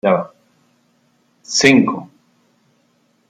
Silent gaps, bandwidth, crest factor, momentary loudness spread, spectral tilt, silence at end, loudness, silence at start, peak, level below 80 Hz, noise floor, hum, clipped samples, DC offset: none; 11 kHz; 20 dB; 18 LU; -4 dB/octave; 1.25 s; -15 LUFS; 0.05 s; 0 dBFS; -60 dBFS; -60 dBFS; none; under 0.1%; under 0.1%